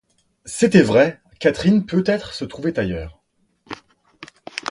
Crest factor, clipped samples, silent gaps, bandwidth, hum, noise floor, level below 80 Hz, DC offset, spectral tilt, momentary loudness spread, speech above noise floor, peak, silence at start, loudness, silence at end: 20 dB; under 0.1%; none; 11.5 kHz; none; -63 dBFS; -46 dBFS; under 0.1%; -6 dB/octave; 23 LU; 46 dB; 0 dBFS; 0.45 s; -19 LUFS; 0 s